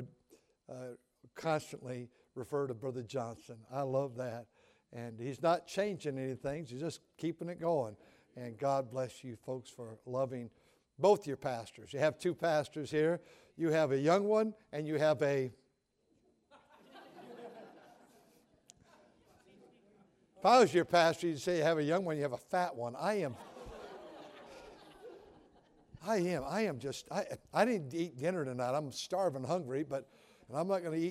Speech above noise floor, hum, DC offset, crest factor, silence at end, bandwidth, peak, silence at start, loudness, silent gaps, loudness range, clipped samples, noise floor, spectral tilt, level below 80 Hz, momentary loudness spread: 42 dB; none; under 0.1%; 22 dB; 0 s; 15.5 kHz; -14 dBFS; 0 s; -35 LUFS; none; 9 LU; under 0.1%; -77 dBFS; -5.5 dB/octave; -72 dBFS; 21 LU